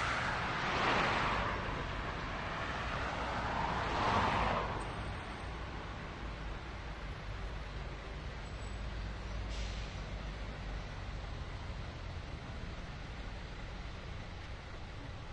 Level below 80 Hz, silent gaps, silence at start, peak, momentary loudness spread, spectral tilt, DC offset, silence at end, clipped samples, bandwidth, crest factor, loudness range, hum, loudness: -46 dBFS; none; 0 s; -18 dBFS; 14 LU; -5 dB/octave; under 0.1%; 0 s; under 0.1%; 10 kHz; 20 dB; 10 LU; none; -39 LUFS